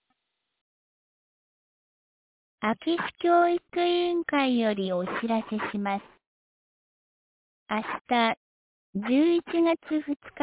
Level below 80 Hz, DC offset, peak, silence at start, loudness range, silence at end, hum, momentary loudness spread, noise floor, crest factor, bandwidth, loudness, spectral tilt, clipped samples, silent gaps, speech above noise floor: -70 dBFS; under 0.1%; -12 dBFS; 2.6 s; 7 LU; 0 s; none; 9 LU; -80 dBFS; 18 dB; 4 kHz; -27 LUFS; -3.5 dB/octave; under 0.1%; 6.27-7.66 s, 8.37-8.93 s, 10.16-10.20 s; 54 dB